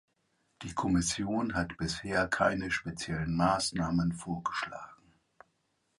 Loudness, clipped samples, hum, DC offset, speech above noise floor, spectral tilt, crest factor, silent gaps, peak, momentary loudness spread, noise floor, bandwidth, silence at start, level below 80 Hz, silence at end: -32 LUFS; under 0.1%; none; under 0.1%; 45 dB; -4.5 dB/octave; 20 dB; none; -12 dBFS; 10 LU; -77 dBFS; 11.5 kHz; 0.6 s; -52 dBFS; 1.05 s